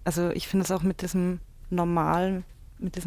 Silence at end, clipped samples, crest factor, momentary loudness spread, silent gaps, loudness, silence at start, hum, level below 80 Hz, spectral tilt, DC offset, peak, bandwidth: 0 s; under 0.1%; 16 dB; 11 LU; none; -28 LUFS; 0 s; none; -46 dBFS; -6 dB/octave; under 0.1%; -12 dBFS; 16 kHz